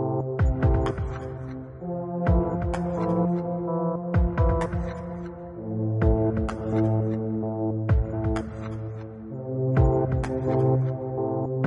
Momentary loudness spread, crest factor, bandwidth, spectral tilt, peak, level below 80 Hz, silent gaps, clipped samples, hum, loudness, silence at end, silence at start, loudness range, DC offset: 12 LU; 16 dB; 10 kHz; -9.5 dB/octave; -8 dBFS; -32 dBFS; none; under 0.1%; none; -26 LUFS; 0 s; 0 s; 2 LU; under 0.1%